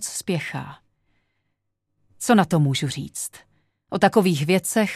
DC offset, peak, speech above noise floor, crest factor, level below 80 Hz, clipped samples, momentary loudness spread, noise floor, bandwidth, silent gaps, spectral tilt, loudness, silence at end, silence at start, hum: under 0.1%; -2 dBFS; 54 dB; 22 dB; -62 dBFS; under 0.1%; 14 LU; -75 dBFS; 15 kHz; none; -5 dB/octave; -22 LUFS; 0 s; 0 s; 50 Hz at -45 dBFS